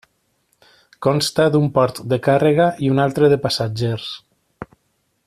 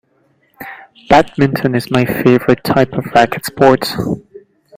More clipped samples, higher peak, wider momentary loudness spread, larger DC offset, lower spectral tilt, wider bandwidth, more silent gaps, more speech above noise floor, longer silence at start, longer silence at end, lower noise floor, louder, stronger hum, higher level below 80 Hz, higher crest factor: second, under 0.1% vs 0.2%; about the same, -2 dBFS vs 0 dBFS; first, 21 LU vs 16 LU; neither; about the same, -6 dB/octave vs -6 dB/octave; second, 14 kHz vs 16.5 kHz; neither; first, 51 dB vs 45 dB; first, 1 s vs 0.6 s; first, 0.6 s vs 0.4 s; first, -67 dBFS vs -57 dBFS; second, -17 LUFS vs -13 LUFS; neither; second, -54 dBFS vs -44 dBFS; about the same, 16 dB vs 14 dB